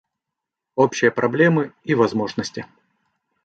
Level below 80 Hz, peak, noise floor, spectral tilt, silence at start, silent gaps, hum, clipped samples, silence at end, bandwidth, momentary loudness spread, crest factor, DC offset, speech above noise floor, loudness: -62 dBFS; -2 dBFS; -84 dBFS; -6 dB/octave; 0.75 s; none; none; under 0.1%; 0.8 s; 8.8 kHz; 13 LU; 20 dB; under 0.1%; 65 dB; -20 LUFS